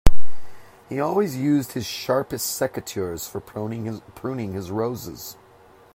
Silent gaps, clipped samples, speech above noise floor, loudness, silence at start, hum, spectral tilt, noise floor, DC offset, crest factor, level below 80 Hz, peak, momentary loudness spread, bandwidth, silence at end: none; 0.2%; 26 dB; -26 LUFS; 0.05 s; none; -5 dB/octave; -51 dBFS; under 0.1%; 18 dB; -32 dBFS; 0 dBFS; 11 LU; 16 kHz; 0 s